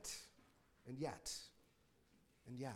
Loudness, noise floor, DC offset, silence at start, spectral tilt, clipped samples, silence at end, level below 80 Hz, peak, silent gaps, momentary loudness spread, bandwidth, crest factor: -50 LUFS; -75 dBFS; under 0.1%; 0 s; -3.5 dB/octave; under 0.1%; 0 s; -74 dBFS; -32 dBFS; none; 18 LU; 16 kHz; 20 dB